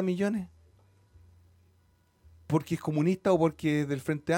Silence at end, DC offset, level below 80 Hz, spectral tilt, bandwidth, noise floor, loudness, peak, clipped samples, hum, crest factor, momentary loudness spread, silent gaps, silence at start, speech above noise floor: 0 s; under 0.1%; -62 dBFS; -7 dB/octave; 17 kHz; -66 dBFS; -29 LUFS; -12 dBFS; under 0.1%; none; 18 dB; 6 LU; none; 0 s; 38 dB